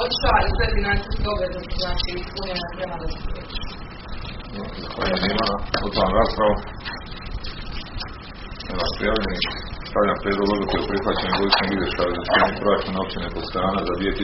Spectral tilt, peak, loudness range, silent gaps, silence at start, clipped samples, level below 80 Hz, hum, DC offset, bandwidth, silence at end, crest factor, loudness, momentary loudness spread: -3 dB/octave; 0 dBFS; 7 LU; none; 0 s; under 0.1%; -30 dBFS; none; under 0.1%; 6 kHz; 0 s; 22 dB; -23 LUFS; 15 LU